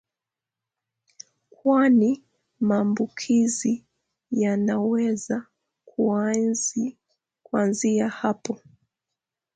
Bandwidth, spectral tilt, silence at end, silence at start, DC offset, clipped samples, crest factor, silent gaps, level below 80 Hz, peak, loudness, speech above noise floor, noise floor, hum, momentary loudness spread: 9.4 kHz; -5 dB/octave; 1 s; 1.65 s; under 0.1%; under 0.1%; 16 dB; none; -70 dBFS; -8 dBFS; -24 LUFS; 66 dB; -88 dBFS; none; 11 LU